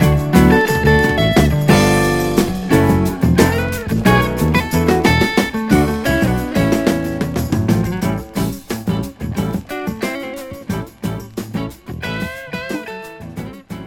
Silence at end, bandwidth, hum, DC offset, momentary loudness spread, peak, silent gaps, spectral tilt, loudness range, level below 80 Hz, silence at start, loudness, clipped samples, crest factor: 0 s; 17.5 kHz; none; under 0.1%; 14 LU; 0 dBFS; none; -6 dB/octave; 11 LU; -30 dBFS; 0 s; -16 LUFS; under 0.1%; 16 dB